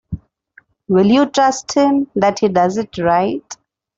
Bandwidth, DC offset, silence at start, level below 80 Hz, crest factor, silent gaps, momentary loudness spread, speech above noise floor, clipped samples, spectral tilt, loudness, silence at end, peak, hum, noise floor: 7.8 kHz; under 0.1%; 0.1 s; -48 dBFS; 14 dB; none; 18 LU; 37 dB; under 0.1%; -5.5 dB/octave; -15 LUFS; 0.45 s; -2 dBFS; none; -51 dBFS